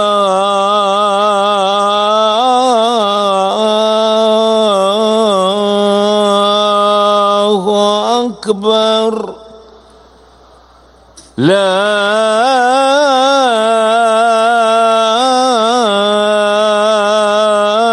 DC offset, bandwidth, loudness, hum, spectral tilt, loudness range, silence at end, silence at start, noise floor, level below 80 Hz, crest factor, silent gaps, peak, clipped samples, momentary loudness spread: under 0.1%; 12 kHz; -11 LUFS; none; -3.5 dB/octave; 6 LU; 0 s; 0 s; -43 dBFS; -54 dBFS; 12 dB; none; 0 dBFS; under 0.1%; 2 LU